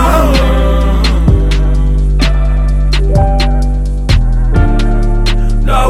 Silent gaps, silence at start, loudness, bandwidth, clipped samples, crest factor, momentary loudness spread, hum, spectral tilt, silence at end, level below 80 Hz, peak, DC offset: none; 0 s; -12 LUFS; 13 kHz; under 0.1%; 8 dB; 4 LU; none; -6.5 dB/octave; 0 s; -10 dBFS; 0 dBFS; under 0.1%